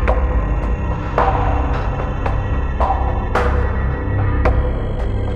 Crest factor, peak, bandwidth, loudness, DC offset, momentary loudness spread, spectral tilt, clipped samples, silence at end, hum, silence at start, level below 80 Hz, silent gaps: 14 dB; -2 dBFS; 7 kHz; -19 LUFS; under 0.1%; 5 LU; -8.5 dB/octave; under 0.1%; 0 s; none; 0 s; -20 dBFS; none